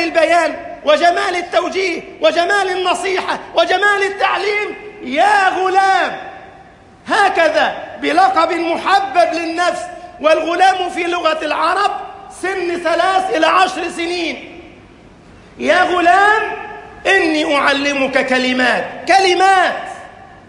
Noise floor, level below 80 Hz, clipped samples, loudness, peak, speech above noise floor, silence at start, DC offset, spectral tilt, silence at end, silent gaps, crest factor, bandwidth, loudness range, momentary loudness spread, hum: -42 dBFS; -52 dBFS; under 0.1%; -14 LUFS; 0 dBFS; 27 dB; 0 s; under 0.1%; -2.5 dB/octave; 0.15 s; none; 14 dB; 11.5 kHz; 3 LU; 10 LU; none